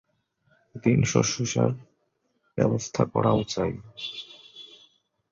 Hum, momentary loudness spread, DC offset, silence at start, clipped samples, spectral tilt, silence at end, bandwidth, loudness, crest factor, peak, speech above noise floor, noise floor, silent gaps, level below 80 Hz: none; 21 LU; under 0.1%; 0.75 s; under 0.1%; -5.5 dB/octave; 0.65 s; 7.8 kHz; -26 LUFS; 20 dB; -6 dBFS; 48 dB; -73 dBFS; none; -54 dBFS